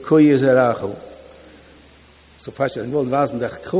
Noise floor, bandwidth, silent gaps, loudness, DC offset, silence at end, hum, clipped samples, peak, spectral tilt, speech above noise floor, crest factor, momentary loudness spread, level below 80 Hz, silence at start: -49 dBFS; 4 kHz; none; -18 LUFS; under 0.1%; 0 s; none; under 0.1%; -2 dBFS; -11.5 dB/octave; 32 dB; 18 dB; 22 LU; -52 dBFS; 0 s